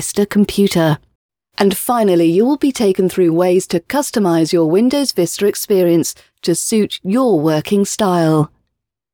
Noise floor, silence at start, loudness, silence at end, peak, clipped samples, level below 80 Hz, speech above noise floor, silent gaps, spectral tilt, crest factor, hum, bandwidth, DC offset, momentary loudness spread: -74 dBFS; 0 s; -15 LUFS; 0.65 s; 0 dBFS; under 0.1%; -50 dBFS; 60 dB; 1.15-1.29 s; -5.5 dB/octave; 14 dB; none; over 20 kHz; under 0.1%; 5 LU